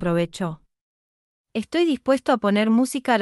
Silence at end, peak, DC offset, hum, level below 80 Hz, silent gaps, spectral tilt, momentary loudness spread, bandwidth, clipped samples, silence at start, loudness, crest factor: 0 s; -6 dBFS; under 0.1%; none; -58 dBFS; 0.81-1.45 s; -5.5 dB/octave; 12 LU; 12 kHz; under 0.1%; 0 s; -22 LUFS; 16 dB